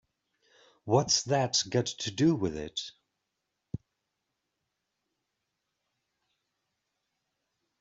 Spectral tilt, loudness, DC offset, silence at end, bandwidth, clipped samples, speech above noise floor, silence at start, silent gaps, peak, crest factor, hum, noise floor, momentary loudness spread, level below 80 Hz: -4 dB/octave; -28 LUFS; under 0.1%; 4.05 s; 7.8 kHz; under 0.1%; 55 dB; 0.85 s; none; -12 dBFS; 24 dB; none; -84 dBFS; 18 LU; -64 dBFS